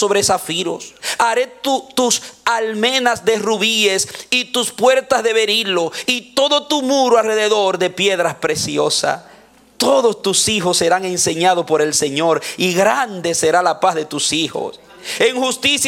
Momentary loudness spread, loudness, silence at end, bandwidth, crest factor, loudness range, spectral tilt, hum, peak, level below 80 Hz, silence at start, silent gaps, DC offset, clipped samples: 5 LU; -16 LUFS; 0 s; 17 kHz; 16 dB; 2 LU; -2 dB/octave; none; 0 dBFS; -58 dBFS; 0 s; none; under 0.1%; under 0.1%